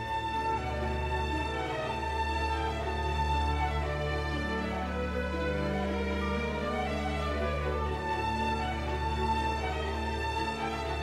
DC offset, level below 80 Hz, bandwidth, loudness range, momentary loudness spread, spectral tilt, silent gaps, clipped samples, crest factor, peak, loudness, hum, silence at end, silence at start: under 0.1%; -38 dBFS; 12 kHz; 1 LU; 3 LU; -6 dB/octave; none; under 0.1%; 14 dB; -18 dBFS; -32 LUFS; none; 0 s; 0 s